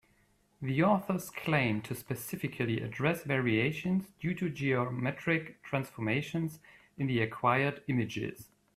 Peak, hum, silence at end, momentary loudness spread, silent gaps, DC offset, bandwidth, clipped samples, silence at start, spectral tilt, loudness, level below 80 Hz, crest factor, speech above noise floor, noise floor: -14 dBFS; none; 0.3 s; 9 LU; none; under 0.1%; 15.5 kHz; under 0.1%; 0.6 s; -6.5 dB/octave; -32 LUFS; -66 dBFS; 20 dB; 37 dB; -69 dBFS